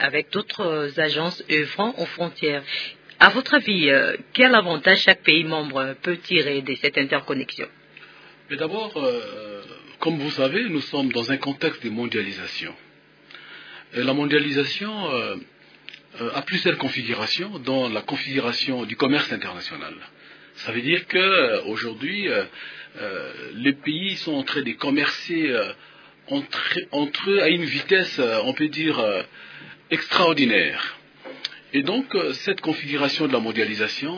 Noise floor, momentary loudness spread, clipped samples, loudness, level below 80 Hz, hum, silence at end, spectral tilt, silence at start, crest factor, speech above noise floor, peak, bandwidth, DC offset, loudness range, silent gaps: -51 dBFS; 16 LU; under 0.1%; -22 LUFS; -70 dBFS; none; 0 s; -5 dB/octave; 0 s; 24 dB; 29 dB; 0 dBFS; 5.4 kHz; under 0.1%; 8 LU; none